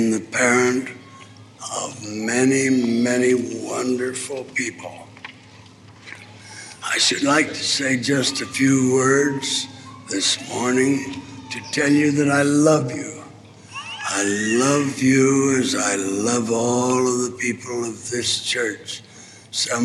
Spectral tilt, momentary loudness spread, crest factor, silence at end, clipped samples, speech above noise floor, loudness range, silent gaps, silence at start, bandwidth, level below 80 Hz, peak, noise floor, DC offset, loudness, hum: -3.5 dB/octave; 18 LU; 18 dB; 0 s; under 0.1%; 25 dB; 5 LU; none; 0 s; 13 kHz; -66 dBFS; -4 dBFS; -45 dBFS; under 0.1%; -20 LUFS; none